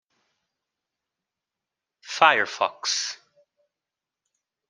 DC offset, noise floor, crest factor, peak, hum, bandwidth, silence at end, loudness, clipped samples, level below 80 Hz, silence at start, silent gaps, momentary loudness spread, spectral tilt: under 0.1%; -88 dBFS; 28 dB; -2 dBFS; none; 11 kHz; 1.55 s; -22 LUFS; under 0.1%; -84 dBFS; 2.05 s; none; 16 LU; 0 dB/octave